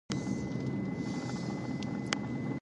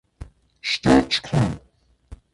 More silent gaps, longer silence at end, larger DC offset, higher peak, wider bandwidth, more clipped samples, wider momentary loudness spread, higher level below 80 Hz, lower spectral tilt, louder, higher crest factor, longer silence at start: neither; second, 0 s vs 0.2 s; neither; second, -10 dBFS vs -4 dBFS; about the same, 11.5 kHz vs 11.5 kHz; neither; second, 2 LU vs 13 LU; second, -58 dBFS vs -42 dBFS; about the same, -5.5 dB/octave vs -5.5 dB/octave; second, -36 LUFS vs -21 LUFS; first, 26 dB vs 20 dB; about the same, 0.1 s vs 0.2 s